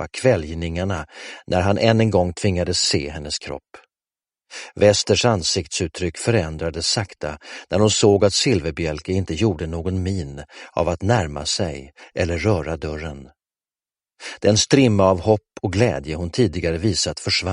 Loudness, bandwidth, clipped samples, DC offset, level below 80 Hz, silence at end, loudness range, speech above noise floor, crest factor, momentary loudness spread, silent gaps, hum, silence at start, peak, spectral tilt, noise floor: -20 LUFS; 11 kHz; under 0.1%; under 0.1%; -40 dBFS; 0 s; 4 LU; over 70 dB; 20 dB; 16 LU; none; none; 0 s; 0 dBFS; -4.5 dB/octave; under -90 dBFS